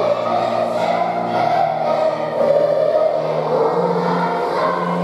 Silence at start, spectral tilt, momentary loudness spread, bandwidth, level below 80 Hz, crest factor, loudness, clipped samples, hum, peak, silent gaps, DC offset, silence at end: 0 s; -6.5 dB/octave; 3 LU; 12 kHz; -66 dBFS; 14 dB; -18 LUFS; under 0.1%; none; -4 dBFS; none; under 0.1%; 0 s